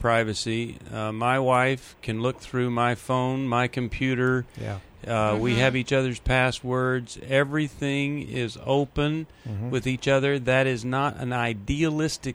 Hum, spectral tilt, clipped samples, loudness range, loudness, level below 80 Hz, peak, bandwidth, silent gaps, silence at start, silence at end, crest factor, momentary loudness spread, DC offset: none; -6 dB/octave; under 0.1%; 2 LU; -25 LUFS; -44 dBFS; -8 dBFS; 13 kHz; none; 0 s; 0 s; 18 dB; 9 LU; under 0.1%